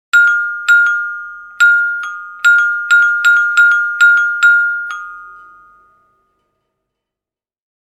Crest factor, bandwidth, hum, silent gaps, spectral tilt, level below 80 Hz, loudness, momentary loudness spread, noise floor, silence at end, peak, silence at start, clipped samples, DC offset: 14 dB; 13.5 kHz; none; none; 4 dB/octave; -68 dBFS; -10 LUFS; 15 LU; -88 dBFS; 2.5 s; 0 dBFS; 0.15 s; under 0.1%; under 0.1%